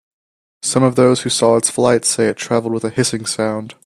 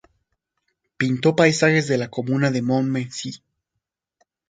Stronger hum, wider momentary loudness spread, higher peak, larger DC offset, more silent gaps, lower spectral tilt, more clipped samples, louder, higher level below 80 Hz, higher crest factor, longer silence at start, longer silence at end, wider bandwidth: neither; second, 7 LU vs 12 LU; about the same, 0 dBFS vs 0 dBFS; neither; neither; second, -4 dB/octave vs -5.5 dB/octave; neither; first, -16 LUFS vs -20 LUFS; first, -56 dBFS vs -64 dBFS; second, 16 dB vs 22 dB; second, 0.65 s vs 1 s; second, 0.15 s vs 1.15 s; first, 14 kHz vs 9.4 kHz